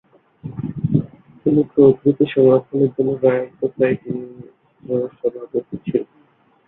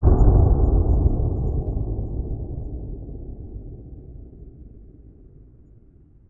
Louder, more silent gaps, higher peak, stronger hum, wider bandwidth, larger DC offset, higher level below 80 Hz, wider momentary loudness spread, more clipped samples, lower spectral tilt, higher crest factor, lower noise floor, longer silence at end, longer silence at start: first, -19 LUFS vs -22 LUFS; neither; about the same, -2 dBFS vs -2 dBFS; neither; first, 3.9 kHz vs 1.6 kHz; neither; second, -54 dBFS vs -24 dBFS; second, 16 LU vs 25 LU; neither; second, -12 dB/octave vs -14 dB/octave; about the same, 18 dB vs 20 dB; first, -56 dBFS vs -51 dBFS; second, 0.65 s vs 1.45 s; first, 0.45 s vs 0 s